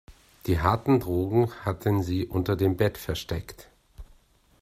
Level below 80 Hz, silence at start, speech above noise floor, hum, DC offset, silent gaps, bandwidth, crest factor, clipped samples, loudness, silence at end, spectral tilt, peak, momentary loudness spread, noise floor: -46 dBFS; 0.1 s; 34 dB; none; under 0.1%; none; 16 kHz; 22 dB; under 0.1%; -26 LUFS; 0.55 s; -7 dB/octave; -6 dBFS; 10 LU; -60 dBFS